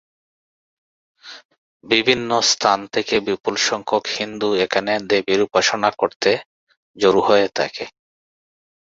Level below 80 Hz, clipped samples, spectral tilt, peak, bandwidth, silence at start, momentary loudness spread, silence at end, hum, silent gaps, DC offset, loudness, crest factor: -60 dBFS; under 0.1%; -2.5 dB/octave; -2 dBFS; 7.8 kHz; 1.25 s; 9 LU; 0.9 s; none; 1.45-1.49 s, 1.58-1.80 s, 6.16-6.20 s, 6.46-6.67 s, 6.77-6.94 s; under 0.1%; -18 LUFS; 20 dB